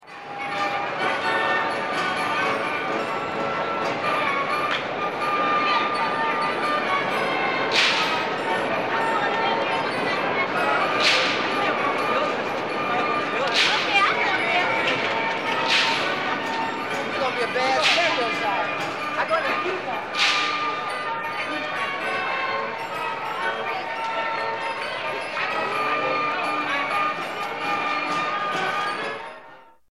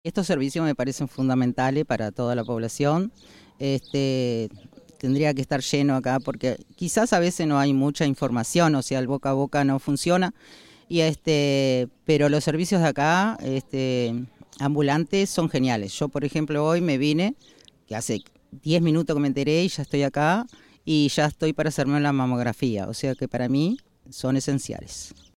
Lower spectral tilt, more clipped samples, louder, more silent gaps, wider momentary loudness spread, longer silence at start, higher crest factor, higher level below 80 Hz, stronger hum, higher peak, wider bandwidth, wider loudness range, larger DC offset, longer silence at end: second, -3 dB/octave vs -5.5 dB/octave; neither; about the same, -23 LUFS vs -24 LUFS; neither; about the same, 8 LU vs 8 LU; about the same, 0 s vs 0.05 s; about the same, 16 dB vs 16 dB; second, -68 dBFS vs -56 dBFS; neither; about the same, -6 dBFS vs -8 dBFS; about the same, 15.5 kHz vs 15.5 kHz; about the same, 5 LU vs 3 LU; first, 0.2% vs under 0.1%; about the same, 0.25 s vs 0.3 s